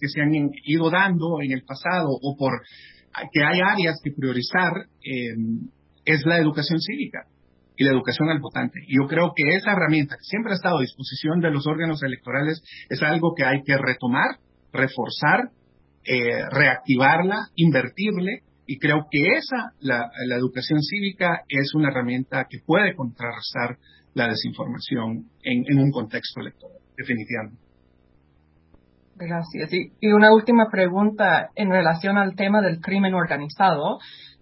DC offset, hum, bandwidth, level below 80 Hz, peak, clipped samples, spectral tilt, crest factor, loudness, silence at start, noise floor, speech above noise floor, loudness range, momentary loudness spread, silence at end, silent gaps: under 0.1%; none; 5.8 kHz; -62 dBFS; 0 dBFS; under 0.1%; -10 dB/octave; 22 dB; -22 LUFS; 0 s; -59 dBFS; 38 dB; 6 LU; 12 LU; 0.15 s; none